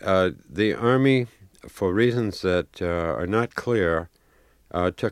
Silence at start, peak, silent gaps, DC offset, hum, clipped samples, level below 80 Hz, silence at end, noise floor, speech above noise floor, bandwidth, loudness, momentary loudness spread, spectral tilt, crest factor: 0 s; -6 dBFS; none; under 0.1%; none; under 0.1%; -54 dBFS; 0 s; -59 dBFS; 36 dB; 14.5 kHz; -24 LUFS; 8 LU; -7 dB/octave; 18 dB